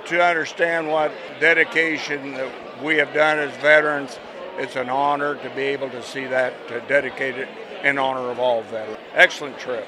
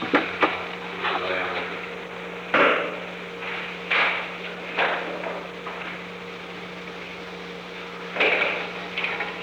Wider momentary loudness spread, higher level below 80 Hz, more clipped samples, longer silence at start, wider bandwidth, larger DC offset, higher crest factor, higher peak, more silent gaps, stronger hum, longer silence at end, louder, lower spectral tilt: about the same, 14 LU vs 15 LU; second, -68 dBFS vs -62 dBFS; neither; about the same, 0 s vs 0 s; second, 12.5 kHz vs over 20 kHz; neither; about the same, 22 dB vs 22 dB; first, 0 dBFS vs -6 dBFS; neither; neither; about the same, 0 s vs 0 s; first, -20 LUFS vs -26 LUFS; about the same, -4 dB/octave vs -4.5 dB/octave